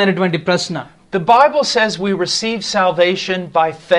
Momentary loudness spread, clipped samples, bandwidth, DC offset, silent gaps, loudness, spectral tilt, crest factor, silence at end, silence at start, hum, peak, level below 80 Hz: 9 LU; under 0.1%; 11.5 kHz; under 0.1%; none; -15 LUFS; -4 dB/octave; 16 dB; 0 s; 0 s; none; 0 dBFS; -54 dBFS